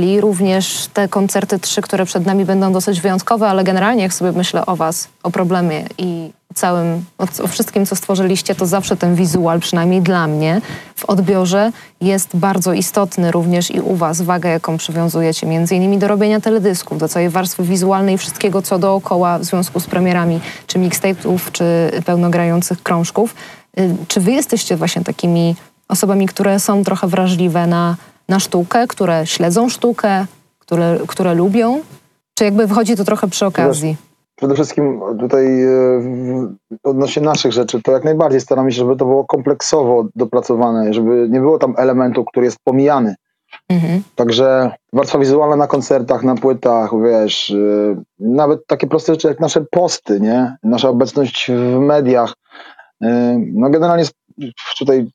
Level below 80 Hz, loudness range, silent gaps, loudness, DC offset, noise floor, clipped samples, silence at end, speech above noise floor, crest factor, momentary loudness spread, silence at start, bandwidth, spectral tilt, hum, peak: -60 dBFS; 2 LU; none; -15 LUFS; under 0.1%; -40 dBFS; under 0.1%; 0.05 s; 26 dB; 14 dB; 6 LU; 0 s; 15 kHz; -5.5 dB/octave; none; 0 dBFS